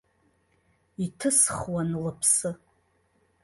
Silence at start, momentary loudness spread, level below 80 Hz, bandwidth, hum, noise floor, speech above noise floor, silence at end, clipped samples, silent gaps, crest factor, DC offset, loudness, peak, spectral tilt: 1 s; 15 LU; -58 dBFS; 12 kHz; none; -68 dBFS; 42 dB; 0.85 s; under 0.1%; none; 22 dB; under 0.1%; -25 LUFS; -8 dBFS; -3.5 dB/octave